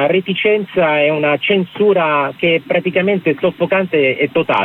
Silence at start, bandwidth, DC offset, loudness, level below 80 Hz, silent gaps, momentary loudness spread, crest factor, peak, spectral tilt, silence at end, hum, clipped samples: 0 s; 4.2 kHz; under 0.1%; -15 LUFS; -58 dBFS; none; 3 LU; 12 dB; -4 dBFS; -8 dB/octave; 0 s; none; under 0.1%